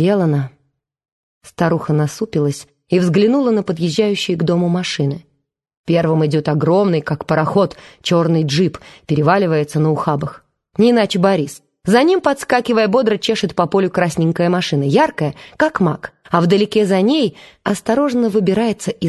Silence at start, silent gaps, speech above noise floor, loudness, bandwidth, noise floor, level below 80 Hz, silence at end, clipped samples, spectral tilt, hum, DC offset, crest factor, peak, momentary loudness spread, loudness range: 0 s; 1.12-1.41 s, 5.77-5.84 s; 49 dB; -16 LUFS; 12.5 kHz; -65 dBFS; -52 dBFS; 0 s; under 0.1%; -6.5 dB/octave; none; under 0.1%; 16 dB; 0 dBFS; 8 LU; 2 LU